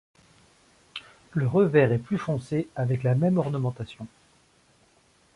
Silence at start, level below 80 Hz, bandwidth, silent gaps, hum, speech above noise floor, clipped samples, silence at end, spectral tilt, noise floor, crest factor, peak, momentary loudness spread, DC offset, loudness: 0.95 s; -60 dBFS; 11 kHz; none; none; 38 dB; under 0.1%; 1.3 s; -8.5 dB/octave; -62 dBFS; 20 dB; -6 dBFS; 20 LU; under 0.1%; -25 LUFS